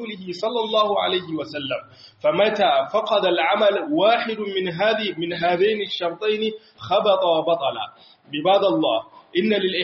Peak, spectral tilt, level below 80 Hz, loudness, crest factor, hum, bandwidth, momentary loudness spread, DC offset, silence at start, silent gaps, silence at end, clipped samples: -6 dBFS; -2 dB/octave; -68 dBFS; -21 LUFS; 16 dB; none; 7 kHz; 10 LU; under 0.1%; 0 s; none; 0 s; under 0.1%